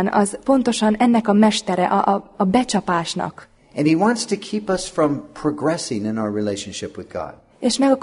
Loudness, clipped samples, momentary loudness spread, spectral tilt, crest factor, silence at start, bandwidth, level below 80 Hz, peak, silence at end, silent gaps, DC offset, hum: -20 LUFS; under 0.1%; 14 LU; -5 dB/octave; 16 dB; 0 s; 11 kHz; -52 dBFS; -2 dBFS; 0 s; none; under 0.1%; none